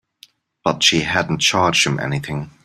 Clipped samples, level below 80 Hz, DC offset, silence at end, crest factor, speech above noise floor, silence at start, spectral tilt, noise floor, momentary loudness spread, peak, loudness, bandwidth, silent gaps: under 0.1%; -50 dBFS; under 0.1%; 0.15 s; 18 dB; 33 dB; 0.65 s; -3 dB/octave; -51 dBFS; 10 LU; 0 dBFS; -17 LUFS; 14.5 kHz; none